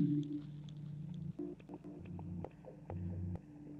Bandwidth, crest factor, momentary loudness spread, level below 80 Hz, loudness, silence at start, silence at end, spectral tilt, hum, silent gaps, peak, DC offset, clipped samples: 7 kHz; 20 dB; 9 LU; -68 dBFS; -46 LUFS; 0 s; 0 s; -10 dB/octave; none; none; -24 dBFS; under 0.1%; under 0.1%